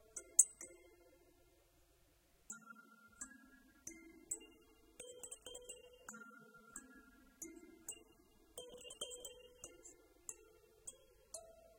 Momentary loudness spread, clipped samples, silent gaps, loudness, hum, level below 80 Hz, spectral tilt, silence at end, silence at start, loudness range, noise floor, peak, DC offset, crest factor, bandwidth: 17 LU; under 0.1%; none; -43 LUFS; none; -76 dBFS; 0 dB/octave; 0 s; 0 s; 8 LU; -73 dBFS; -10 dBFS; under 0.1%; 40 dB; 16.5 kHz